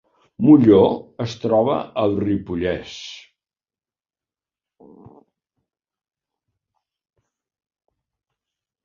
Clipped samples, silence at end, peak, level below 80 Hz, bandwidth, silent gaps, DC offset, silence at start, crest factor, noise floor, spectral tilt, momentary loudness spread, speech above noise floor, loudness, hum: under 0.1%; 5.65 s; -2 dBFS; -52 dBFS; 7.2 kHz; none; under 0.1%; 0.4 s; 20 dB; under -90 dBFS; -8 dB/octave; 18 LU; over 73 dB; -18 LUFS; none